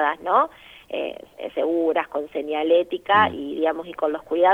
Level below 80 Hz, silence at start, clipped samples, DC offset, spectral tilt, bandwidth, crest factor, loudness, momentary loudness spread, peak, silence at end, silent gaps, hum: -60 dBFS; 0 s; under 0.1%; under 0.1%; -6 dB/octave; 4.3 kHz; 18 dB; -23 LUFS; 11 LU; -4 dBFS; 0 s; none; none